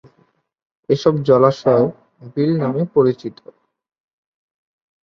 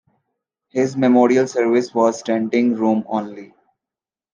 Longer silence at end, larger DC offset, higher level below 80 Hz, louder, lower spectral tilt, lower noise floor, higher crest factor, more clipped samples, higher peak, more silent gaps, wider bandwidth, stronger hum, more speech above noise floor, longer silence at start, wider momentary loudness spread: first, 1.7 s vs 0.9 s; neither; first, -60 dBFS vs -70 dBFS; about the same, -17 LUFS vs -18 LUFS; first, -8.5 dB/octave vs -6 dB/octave; second, -60 dBFS vs -89 dBFS; about the same, 18 dB vs 16 dB; neither; about the same, 0 dBFS vs -2 dBFS; neither; second, 7.2 kHz vs 9 kHz; neither; second, 44 dB vs 72 dB; first, 0.9 s vs 0.75 s; about the same, 12 LU vs 11 LU